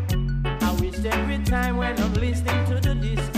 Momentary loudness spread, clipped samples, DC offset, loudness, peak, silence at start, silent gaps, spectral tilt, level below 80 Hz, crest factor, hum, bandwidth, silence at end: 2 LU; under 0.1%; under 0.1%; -24 LUFS; -10 dBFS; 0 s; none; -6 dB/octave; -28 dBFS; 12 dB; none; 15.5 kHz; 0 s